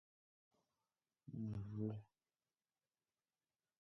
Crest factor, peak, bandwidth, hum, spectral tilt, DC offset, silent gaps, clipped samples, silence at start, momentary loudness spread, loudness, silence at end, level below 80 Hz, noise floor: 20 dB; -32 dBFS; 6 kHz; none; -11 dB/octave; under 0.1%; none; under 0.1%; 1.25 s; 9 LU; -49 LUFS; 1.75 s; -74 dBFS; under -90 dBFS